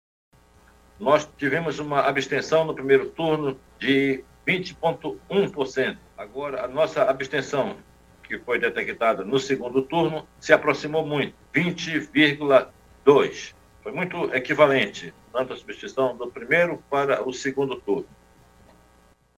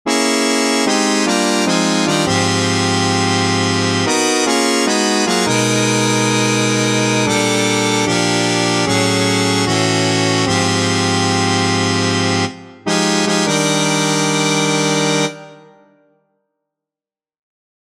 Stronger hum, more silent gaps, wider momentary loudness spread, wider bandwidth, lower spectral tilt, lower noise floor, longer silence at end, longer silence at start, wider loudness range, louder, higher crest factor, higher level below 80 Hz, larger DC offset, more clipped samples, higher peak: neither; neither; first, 13 LU vs 1 LU; about the same, 15 kHz vs 15 kHz; first, -5 dB/octave vs -3.5 dB/octave; second, -58 dBFS vs under -90 dBFS; second, 1.3 s vs 2.3 s; first, 1 s vs 0.05 s; about the same, 4 LU vs 2 LU; second, -23 LUFS vs -14 LUFS; first, 24 dB vs 16 dB; about the same, -58 dBFS vs -54 dBFS; neither; neither; about the same, 0 dBFS vs 0 dBFS